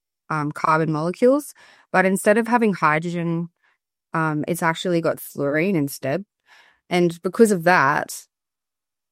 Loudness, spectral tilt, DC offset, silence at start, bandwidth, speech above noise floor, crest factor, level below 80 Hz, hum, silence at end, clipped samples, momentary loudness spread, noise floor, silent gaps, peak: -21 LUFS; -5.5 dB/octave; under 0.1%; 0.3 s; 16 kHz; 68 dB; 20 dB; -68 dBFS; none; 0.9 s; under 0.1%; 11 LU; -89 dBFS; none; -2 dBFS